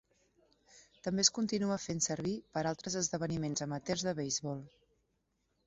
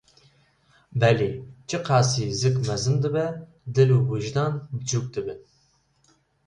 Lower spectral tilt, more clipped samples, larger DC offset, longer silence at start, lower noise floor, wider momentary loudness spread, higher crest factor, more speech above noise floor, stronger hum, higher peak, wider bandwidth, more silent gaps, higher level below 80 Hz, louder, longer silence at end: about the same, -4.5 dB/octave vs -5.5 dB/octave; neither; neither; second, 0.75 s vs 0.9 s; first, -80 dBFS vs -65 dBFS; second, 9 LU vs 13 LU; first, 24 dB vs 18 dB; about the same, 44 dB vs 42 dB; neither; second, -12 dBFS vs -6 dBFS; second, 8 kHz vs 10.5 kHz; neither; second, -68 dBFS vs -54 dBFS; second, -35 LUFS vs -24 LUFS; about the same, 1 s vs 1.1 s